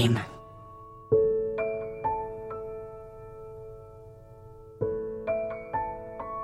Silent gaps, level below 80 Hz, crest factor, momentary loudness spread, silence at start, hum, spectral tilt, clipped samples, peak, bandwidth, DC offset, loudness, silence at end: none; -54 dBFS; 20 dB; 22 LU; 0 s; none; -6.5 dB/octave; under 0.1%; -12 dBFS; 13 kHz; under 0.1%; -31 LUFS; 0 s